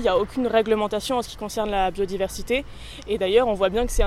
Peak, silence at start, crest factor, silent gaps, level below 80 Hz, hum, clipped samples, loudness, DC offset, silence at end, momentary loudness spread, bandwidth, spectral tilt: -6 dBFS; 0 s; 16 dB; none; -34 dBFS; none; under 0.1%; -23 LUFS; under 0.1%; 0 s; 9 LU; 15.5 kHz; -4.5 dB/octave